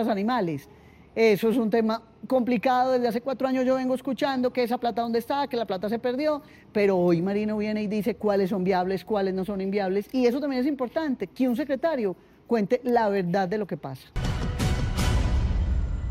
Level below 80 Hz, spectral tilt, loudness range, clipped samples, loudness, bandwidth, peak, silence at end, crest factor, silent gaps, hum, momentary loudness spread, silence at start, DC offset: -36 dBFS; -7 dB/octave; 2 LU; under 0.1%; -26 LUFS; 16 kHz; -10 dBFS; 0 s; 14 dB; none; none; 7 LU; 0 s; under 0.1%